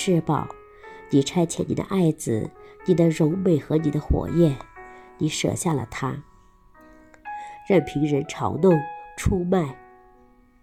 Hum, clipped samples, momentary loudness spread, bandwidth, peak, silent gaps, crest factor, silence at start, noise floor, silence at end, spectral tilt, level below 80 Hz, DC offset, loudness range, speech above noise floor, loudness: none; under 0.1%; 17 LU; 14.5 kHz; -6 dBFS; none; 18 dB; 0 s; -55 dBFS; 0.85 s; -6.5 dB/octave; -42 dBFS; under 0.1%; 4 LU; 33 dB; -23 LUFS